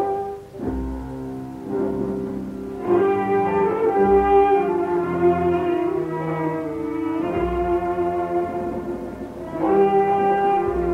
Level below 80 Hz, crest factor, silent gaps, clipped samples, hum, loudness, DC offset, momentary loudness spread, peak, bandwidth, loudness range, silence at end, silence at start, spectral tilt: -40 dBFS; 16 dB; none; under 0.1%; none; -21 LUFS; under 0.1%; 14 LU; -6 dBFS; 8 kHz; 6 LU; 0 s; 0 s; -8.5 dB/octave